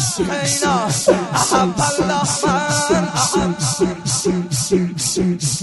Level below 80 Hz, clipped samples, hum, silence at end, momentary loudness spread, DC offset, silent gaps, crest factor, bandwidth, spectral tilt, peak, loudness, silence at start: -42 dBFS; under 0.1%; none; 0 s; 3 LU; under 0.1%; none; 16 dB; 12 kHz; -3.5 dB/octave; -2 dBFS; -17 LUFS; 0 s